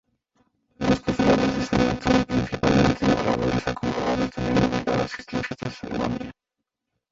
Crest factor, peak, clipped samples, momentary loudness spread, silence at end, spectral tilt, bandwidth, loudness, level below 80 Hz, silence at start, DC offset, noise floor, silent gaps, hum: 18 dB; -6 dBFS; under 0.1%; 10 LU; 0.8 s; -6 dB/octave; 8 kHz; -23 LUFS; -42 dBFS; 0.8 s; under 0.1%; -83 dBFS; none; none